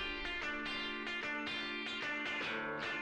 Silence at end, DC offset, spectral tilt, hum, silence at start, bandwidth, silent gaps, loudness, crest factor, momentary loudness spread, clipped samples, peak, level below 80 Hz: 0 s; under 0.1%; -3 dB/octave; none; 0 s; 11.5 kHz; none; -39 LUFS; 12 dB; 2 LU; under 0.1%; -28 dBFS; -60 dBFS